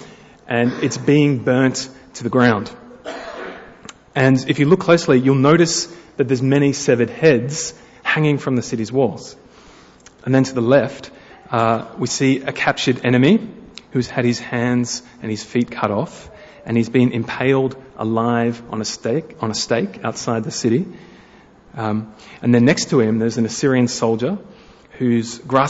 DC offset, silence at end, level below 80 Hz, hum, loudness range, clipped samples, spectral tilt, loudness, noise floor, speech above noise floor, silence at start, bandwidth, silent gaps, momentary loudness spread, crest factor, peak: under 0.1%; 0 s; -54 dBFS; none; 5 LU; under 0.1%; -5.5 dB/octave; -18 LUFS; -47 dBFS; 29 dB; 0 s; 8 kHz; none; 16 LU; 18 dB; -2 dBFS